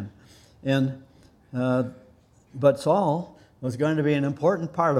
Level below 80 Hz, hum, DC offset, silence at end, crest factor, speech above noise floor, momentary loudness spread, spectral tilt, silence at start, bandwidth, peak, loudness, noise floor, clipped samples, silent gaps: -62 dBFS; none; under 0.1%; 0 s; 20 dB; 33 dB; 15 LU; -7.5 dB/octave; 0 s; 13 kHz; -6 dBFS; -25 LUFS; -56 dBFS; under 0.1%; none